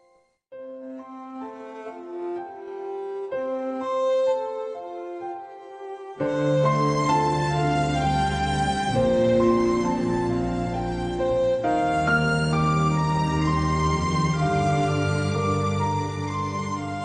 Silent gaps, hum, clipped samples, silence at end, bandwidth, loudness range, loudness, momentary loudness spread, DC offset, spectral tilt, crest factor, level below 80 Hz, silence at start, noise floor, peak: none; none; under 0.1%; 0 s; 10 kHz; 6 LU; -24 LUFS; 16 LU; under 0.1%; -6.5 dB/octave; 14 dB; -42 dBFS; 0.5 s; -62 dBFS; -10 dBFS